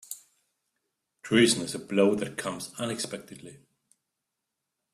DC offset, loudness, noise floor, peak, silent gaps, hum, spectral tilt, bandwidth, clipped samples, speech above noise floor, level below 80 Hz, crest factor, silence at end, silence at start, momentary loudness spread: under 0.1%; -27 LUFS; -84 dBFS; -8 dBFS; none; none; -4 dB/octave; 14.5 kHz; under 0.1%; 57 dB; -68 dBFS; 22 dB; 1.4 s; 0.1 s; 22 LU